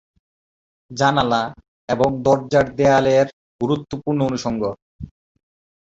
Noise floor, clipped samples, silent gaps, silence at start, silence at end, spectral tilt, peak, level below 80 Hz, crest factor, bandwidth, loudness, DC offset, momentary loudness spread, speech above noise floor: under -90 dBFS; under 0.1%; 1.68-1.88 s, 3.33-3.59 s, 4.82-4.99 s; 0.9 s; 0.8 s; -6 dB/octave; -2 dBFS; -48 dBFS; 18 dB; 8 kHz; -19 LUFS; under 0.1%; 20 LU; over 72 dB